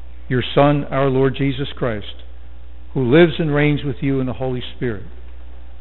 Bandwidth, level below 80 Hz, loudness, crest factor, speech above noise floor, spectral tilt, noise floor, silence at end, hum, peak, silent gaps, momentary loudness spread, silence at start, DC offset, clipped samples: 4.2 kHz; -38 dBFS; -18 LUFS; 20 dB; 20 dB; -6 dB/octave; -38 dBFS; 0 s; none; 0 dBFS; none; 15 LU; 0 s; 4%; under 0.1%